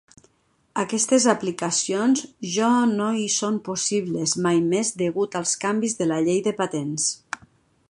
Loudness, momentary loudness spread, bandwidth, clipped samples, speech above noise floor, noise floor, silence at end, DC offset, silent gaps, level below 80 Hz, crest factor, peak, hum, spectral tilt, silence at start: -22 LUFS; 7 LU; 11.5 kHz; under 0.1%; 42 dB; -65 dBFS; 0.55 s; under 0.1%; none; -66 dBFS; 20 dB; -4 dBFS; none; -3.5 dB/octave; 0.75 s